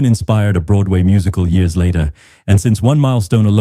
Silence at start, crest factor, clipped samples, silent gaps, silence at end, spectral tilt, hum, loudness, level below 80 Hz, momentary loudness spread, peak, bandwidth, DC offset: 0 s; 10 dB; under 0.1%; none; 0 s; -7.5 dB/octave; none; -14 LUFS; -28 dBFS; 3 LU; -2 dBFS; 13.5 kHz; under 0.1%